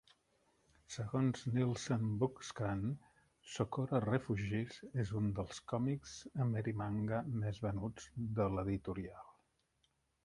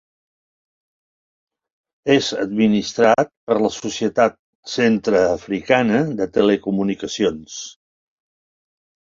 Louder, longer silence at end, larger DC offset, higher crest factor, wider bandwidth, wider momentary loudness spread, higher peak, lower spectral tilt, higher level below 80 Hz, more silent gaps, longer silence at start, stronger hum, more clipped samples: second, -39 LUFS vs -19 LUFS; second, 0.95 s vs 1.35 s; neither; about the same, 20 dB vs 20 dB; first, 11 kHz vs 7.6 kHz; about the same, 9 LU vs 9 LU; second, -20 dBFS vs -2 dBFS; first, -7 dB/octave vs -5 dB/octave; about the same, -60 dBFS vs -56 dBFS; second, none vs 3.37-3.47 s, 4.39-4.63 s; second, 0.9 s vs 2.05 s; neither; neither